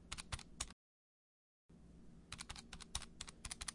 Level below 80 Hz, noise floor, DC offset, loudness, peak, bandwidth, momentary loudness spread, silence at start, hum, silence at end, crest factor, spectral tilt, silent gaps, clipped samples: -60 dBFS; under -90 dBFS; under 0.1%; -50 LUFS; -24 dBFS; 11.5 kHz; 18 LU; 0 s; none; 0 s; 28 dB; -1.5 dB/octave; 0.73-1.69 s; under 0.1%